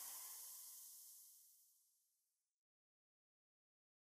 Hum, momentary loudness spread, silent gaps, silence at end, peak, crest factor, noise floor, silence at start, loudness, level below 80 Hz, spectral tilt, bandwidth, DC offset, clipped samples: none; 14 LU; none; 2 s; -40 dBFS; 22 dB; under -90 dBFS; 0 s; -55 LUFS; under -90 dBFS; 4.5 dB/octave; 15.5 kHz; under 0.1%; under 0.1%